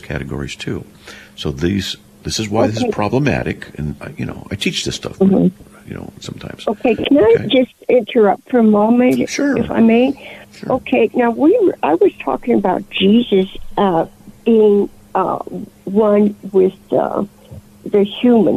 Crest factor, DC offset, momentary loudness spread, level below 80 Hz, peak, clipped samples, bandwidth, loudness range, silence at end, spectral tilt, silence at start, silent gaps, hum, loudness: 12 dB; under 0.1%; 15 LU; -42 dBFS; -4 dBFS; under 0.1%; 14 kHz; 6 LU; 0 s; -6 dB/octave; 0.05 s; none; none; -15 LUFS